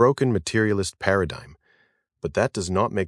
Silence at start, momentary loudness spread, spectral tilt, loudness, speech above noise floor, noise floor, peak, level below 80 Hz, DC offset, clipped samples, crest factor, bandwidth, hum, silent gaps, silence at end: 0 s; 8 LU; -5.5 dB/octave; -24 LUFS; 43 dB; -65 dBFS; -4 dBFS; -52 dBFS; under 0.1%; under 0.1%; 20 dB; 12 kHz; none; none; 0 s